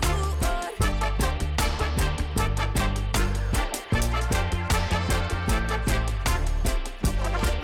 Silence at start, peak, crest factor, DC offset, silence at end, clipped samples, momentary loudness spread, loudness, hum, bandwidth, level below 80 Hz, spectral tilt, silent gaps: 0 s; -14 dBFS; 12 dB; under 0.1%; 0 s; under 0.1%; 2 LU; -26 LUFS; none; 17 kHz; -26 dBFS; -4.5 dB/octave; none